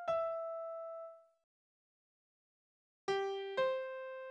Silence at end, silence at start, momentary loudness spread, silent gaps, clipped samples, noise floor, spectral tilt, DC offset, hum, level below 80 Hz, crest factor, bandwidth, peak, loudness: 0 s; 0 s; 11 LU; 1.44-3.08 s; under 0.1%; under -90 dBFS; -4 dB/octave; under 0.1%; none; -82 dBFS; 18 dB; 9.4 kHz; -24 dBFS; -40 LUFS